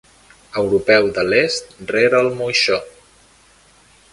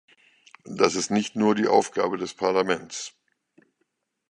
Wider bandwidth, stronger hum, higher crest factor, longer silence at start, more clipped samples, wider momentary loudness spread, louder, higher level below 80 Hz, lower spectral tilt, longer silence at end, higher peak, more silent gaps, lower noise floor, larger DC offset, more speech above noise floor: about the same, 11.5 kHz vs 10.5 kHz; neither; second, 18 dB vs 24 dB; about the same, 0.55 s vs 0.65 s; neither; second, 9 LU vs 14 LU; first, -17 LUFS vs -24 LUFS; first, -52 dBFS vs -66 dBFS; about the same, -3.5 dB/octave vs -4 dB/octave; about the same, 1.25 s vs 1.2 s; about the same, 0 dBFS vs -2 dBFS; neither; second, -51 dBFS vs -75 dBFS; neither; second, 35 dB vs 52 dB